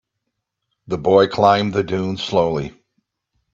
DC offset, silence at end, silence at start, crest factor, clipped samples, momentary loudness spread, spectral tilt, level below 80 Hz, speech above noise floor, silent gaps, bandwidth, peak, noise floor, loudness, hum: under 0.1%; 0.85 s; 0.9 s; 20 dB; under 0.1%; 12 LU; -6.5 dB/octave; -52 dBFS; 60 dB; none; 7.6 kHz; 0 dBFS; -77 dBFS; -18 LUFS; none